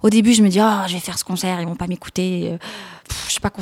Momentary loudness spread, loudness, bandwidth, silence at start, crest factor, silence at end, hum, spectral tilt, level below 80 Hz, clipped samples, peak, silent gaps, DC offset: 16 LU; -19 LUFS; 16.5 kHz; 0.05 s; 18 dB; 0 s; none; -4.5 dB/octave; -44 dBFS; under 0.1%; -2 dBFS; none; under 0.1%